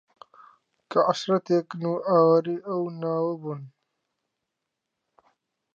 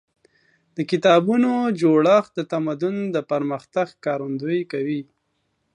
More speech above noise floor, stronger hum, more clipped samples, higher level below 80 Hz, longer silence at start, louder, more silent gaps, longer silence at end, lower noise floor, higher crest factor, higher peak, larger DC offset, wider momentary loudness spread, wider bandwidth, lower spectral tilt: first, 59 dB vs 51 dB; neither; neither; second, -80 dBFS vs -72 dBFS; first, 0.9 s vs 0.75 s; second, -25 LUFS vs -21 LUFS; neither; first, 2.1 s vs 0.75 s; first, -83 dBFS vs -72 dBFS; about the same, 18 dB vs 18 dB; second, -8 dBFS vs -2 dBFS; neither; about the same, 11 LU vs 10 LU; second, 7.6 kHz vs 10.5 kHz; about the same, -7 dB/octave vs -7 dB/octave